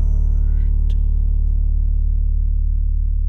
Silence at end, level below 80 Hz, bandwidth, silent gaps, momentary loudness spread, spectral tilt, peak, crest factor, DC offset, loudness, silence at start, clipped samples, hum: 0 s; -16 dBFS; 1 kHz; none; 2 LU; -10 dB/octave; -8 dBFS; 8 dB; under 0.1%; -21 LUFS; 0 s; under 0.1%; none